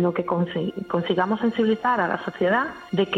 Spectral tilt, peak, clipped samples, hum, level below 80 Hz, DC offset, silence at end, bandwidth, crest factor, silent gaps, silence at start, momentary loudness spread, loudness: -7.5 dB/octave; -10 dBFS; under 0.1%; none; -62 dBFS; under 0.1%; 0 s; 7.6 kHz; 14 dB; none; 0 s; 5 LU; -24 LUFS